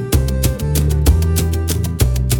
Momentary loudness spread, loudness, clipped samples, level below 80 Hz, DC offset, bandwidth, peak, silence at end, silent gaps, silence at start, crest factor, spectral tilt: 4 LU; -17 LUFS; under 0.1%; -20 dBFS; under 0.1%; 19 kHz; -2 dBFS; 0 s; none; 0 s; 14 dB; -5.5 dB/octave